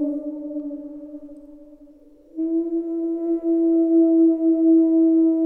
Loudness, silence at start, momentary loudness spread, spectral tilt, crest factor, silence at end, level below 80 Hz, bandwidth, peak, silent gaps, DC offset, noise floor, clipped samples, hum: -19 LUFS; 0 s; 20 LU; -10.5 dB/octave; 10 dB; 0 s; -60 dBFS; 1.4 kHz; -10 dBFS; none; under 0.1%; -49 dBFS; under 0.1%; none